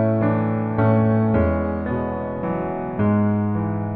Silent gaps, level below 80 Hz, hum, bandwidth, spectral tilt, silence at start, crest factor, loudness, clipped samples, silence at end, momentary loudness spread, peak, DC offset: none; -38 dBFS; none; 3.8 kHz; -12.5 dB/octave; 0 s; 14 dB; -21 LUFS; under 0.1%; 0 s; 7 LU; -6 dBFS; under 0.1%